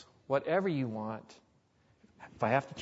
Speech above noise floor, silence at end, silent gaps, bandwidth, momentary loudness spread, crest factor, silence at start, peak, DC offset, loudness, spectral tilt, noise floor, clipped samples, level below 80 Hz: 36 dB; 0 s; none; 8 kHz; 12 LU; 22 dB; 0 s; -14 dBFS; under 0.1%; -33 LUFS; -7 dB/octave; -69 dBFS; under 0.1%; -74 dBFS